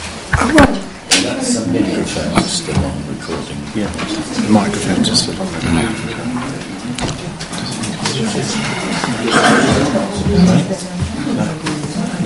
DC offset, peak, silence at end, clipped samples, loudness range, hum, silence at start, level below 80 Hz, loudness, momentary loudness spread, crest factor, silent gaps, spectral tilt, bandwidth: under 0.1%; 0 dBFS; 0 s; under 0.1%; 5 LU; none; 0 s; -34 dBFS; -16 LUFS; 12 LU; 16 dB; none; -4.5 dB/octave; 11.5 kHz